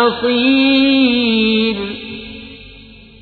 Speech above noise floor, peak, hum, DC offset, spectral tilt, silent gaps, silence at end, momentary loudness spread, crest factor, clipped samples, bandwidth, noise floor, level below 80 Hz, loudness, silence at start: 26 dB; -2 dBFS; none; under 0.1%; -7 dB/octave; none; 0.4 s; 19 LU; 14 dB; under 0.1%; 4.6 kHz; -39 dBFS; -46 dBFS; -13 LUFS; 0 s